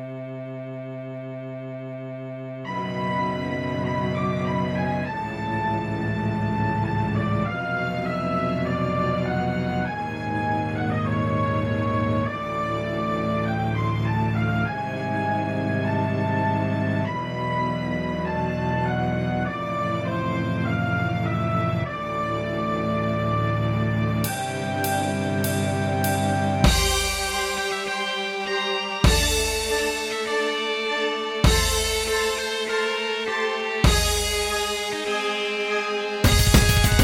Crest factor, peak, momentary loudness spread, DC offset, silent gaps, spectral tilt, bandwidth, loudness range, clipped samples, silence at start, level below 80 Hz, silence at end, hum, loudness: 22 dB; -2 dBFS; 7 LU; under 0.1%; none; -4.5 dB/octave; 16 kHz; 4 LU; under 0.1%; 0 s; -34 dBFS; 0 s; none; -24 LUFS